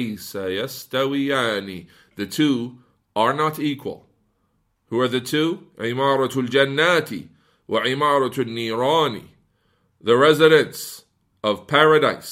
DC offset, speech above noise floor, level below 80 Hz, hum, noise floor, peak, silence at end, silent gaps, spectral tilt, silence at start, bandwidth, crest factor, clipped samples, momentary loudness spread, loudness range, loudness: under 0.1%; 48 dB; -66 dBFS; none; -68 dBFS; 0 dBFS; 0 s; none; -5 dB/octave; 0 s; 16 kHz; 20 dB; under 0.1%; 17 LU; 5 LU; -20 LUFS